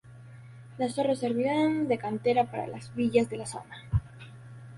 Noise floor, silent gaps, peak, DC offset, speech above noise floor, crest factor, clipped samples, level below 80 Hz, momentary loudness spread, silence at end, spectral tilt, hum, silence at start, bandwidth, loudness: -48 dBFS; none; -10 dBFS; under 0.1%; 20 dB; 20 dB; under 0.1%; -48 dBFS; 22 LU; 0 s; -6.5 dB/octave; none; 0.05 s; 11.5 kHz; -29 LUFS